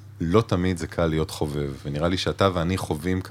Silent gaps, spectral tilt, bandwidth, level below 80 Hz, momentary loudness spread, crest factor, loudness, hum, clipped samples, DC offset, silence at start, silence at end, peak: none; -6 dB/octave; 16 kHz; -42 dBFS; 6 LU; 20 dB; -25 LUFS; none; under 0.1%; under 0.1%; 0 s; 0 s; -4 dBFS